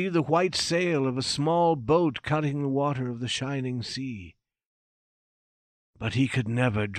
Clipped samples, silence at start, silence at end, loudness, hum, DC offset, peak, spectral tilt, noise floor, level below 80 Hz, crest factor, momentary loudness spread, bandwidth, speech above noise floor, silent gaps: under 0.1%; 0 s; 0 s; -26 LUFS; none; under 0.1%; -12 dBFS; -5.5 dB/octave; under -90 dBFS; -58 dBFS; 16 dB; 9 LU; 12.5 kHz; over 64 dB; 4.66-5.93 s